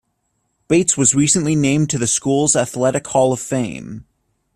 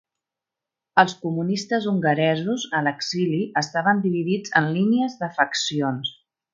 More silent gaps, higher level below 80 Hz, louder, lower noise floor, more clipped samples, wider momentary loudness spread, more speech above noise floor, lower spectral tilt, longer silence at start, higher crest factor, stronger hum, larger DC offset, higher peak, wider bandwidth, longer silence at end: neither; first, -52 dBFS vs -68 dBFS; first, -16 LUFS vs -22 LUFS; second, -69 dBFS vs -87 dBFS; neither; first, 11 LU vs 5 LU; second, 52 dB vs 65 dB; about the same, -4.5 dB/octave vs -5 dB/octave; second, 0.7 s vs 0.95 s; about the same, 18 dB vs 22 dB; neither; neither; about the same, 0 dBFS vs 0 dBFS; first, 14 kHz vs 7.6 kHz; first, 0.55 s vs 0.4 s